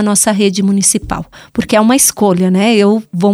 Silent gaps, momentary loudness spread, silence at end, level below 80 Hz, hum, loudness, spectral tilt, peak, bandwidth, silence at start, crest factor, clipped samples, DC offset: none; 12 LU; 0 s; -40 dBFS; none; -11 LUFS; -4 dB/octave; 0 dBFS; 15.5 kHz; 0 s; 12 dB; under 0.1%; under 0.1%